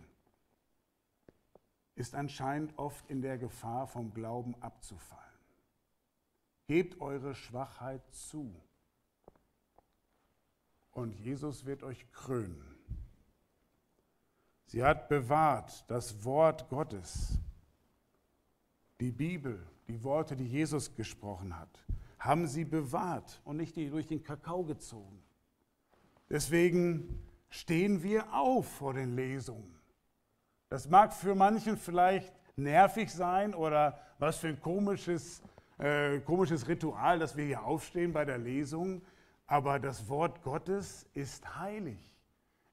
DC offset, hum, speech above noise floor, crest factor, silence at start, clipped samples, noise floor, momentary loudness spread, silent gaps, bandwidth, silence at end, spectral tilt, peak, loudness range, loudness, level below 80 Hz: under 0.1%; none; 47 dB; 24 dB; 1.95 s; under 0.1%; -80 dBFS; 18 LU; none; 16 kHz; 0.7 s; -6 dB/octave; -10 dBFS; 13 LU; -34 LUFS; -54 dBFS